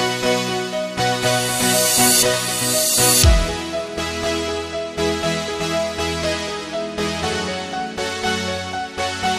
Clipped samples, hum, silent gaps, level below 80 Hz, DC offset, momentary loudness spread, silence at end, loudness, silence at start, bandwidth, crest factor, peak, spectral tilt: under 0.1%; none; none; -30 dBFS; under 0.1%; 12 LU; 0 s; -19 LUFS; 0 s; 15.5 kHz; 18 dB; -2 dBFS; -2.5 dB/octave